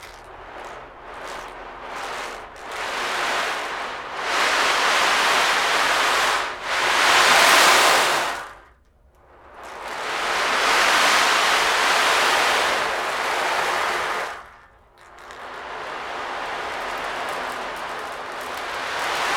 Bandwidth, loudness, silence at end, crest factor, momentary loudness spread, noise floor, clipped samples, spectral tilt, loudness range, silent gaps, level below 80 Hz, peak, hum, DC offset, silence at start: 20 kHz; -19 LUFS; 0 s; 20 dB; 20 LU; -55 dBFS; under 0.1%; 0 dB/octave; 13 LU; none; -54 dBFS; -2 dBFS; none; under 0.1%; 0 s